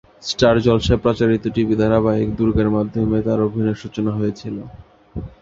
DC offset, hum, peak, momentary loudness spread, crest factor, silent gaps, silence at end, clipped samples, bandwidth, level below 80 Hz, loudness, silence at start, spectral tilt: under 0.1%; none; -2 dBFS; 14 LU; 18 dB; none; 0.15 s; under 0.1%; 7.6 kHz; -36 dBFS; -18 LUFS; 0.2 s; -7 dB/octave